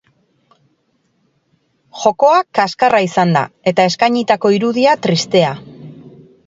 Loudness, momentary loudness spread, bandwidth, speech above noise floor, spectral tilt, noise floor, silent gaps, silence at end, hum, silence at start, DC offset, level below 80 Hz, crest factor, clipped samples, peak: -14 LUFS; 5 LU; 7.8 kHz; 49 dB; -5 dB/octave; -62 dBFS; none; 0.4 s; none; 1.95 s; under 0.1%; -60 dBFS; 16 dB; under 0.1%; 0 dBFS